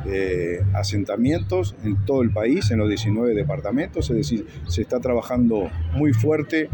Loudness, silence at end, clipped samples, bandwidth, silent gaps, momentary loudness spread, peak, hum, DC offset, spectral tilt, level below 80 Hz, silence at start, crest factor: -22 LUFS; 0 s; under 0.1%; 17.5 kHz; none; 5 LU; -8 dBFS; none; under 0.1%; -7 dB/octave; -38 dBFS; 0 s; 14 dB